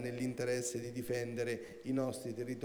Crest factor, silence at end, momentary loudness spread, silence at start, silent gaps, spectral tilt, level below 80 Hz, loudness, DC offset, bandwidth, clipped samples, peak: 14 dB; 0 s; 5 LU; 0 s; none; -5 dB/octave; -72 dBFS; -39 LUFS; under 0.1%; over 20 kHz; under 0.1%; -24 dBFS